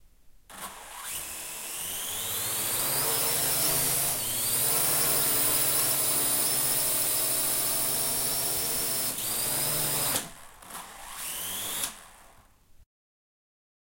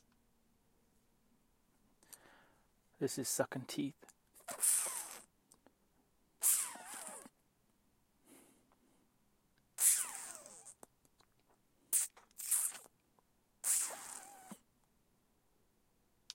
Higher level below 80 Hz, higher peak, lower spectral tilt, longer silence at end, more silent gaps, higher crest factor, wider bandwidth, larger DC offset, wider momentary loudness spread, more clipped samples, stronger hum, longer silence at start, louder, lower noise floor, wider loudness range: first, -56 dBFS vs -82 dBFS; first, -12 dBFS vs -16 dBFS; about the same, -0.5 dB/octave vs -1.5 dB/octave; second, 1 s vs 1.8 s; neither; second, 16 dB vs 28 dB; about the same, 16.5 kHz vs 16.5 kHz; neither; second, 14 LU vs 23 LU; neither; neither; second, 0.05 s vs 2.1 s; first, -25 LUFS vs -35 LUFS; second, -56 dBFS vs -76 dBFS; about the same, 8 LU vs 7 LU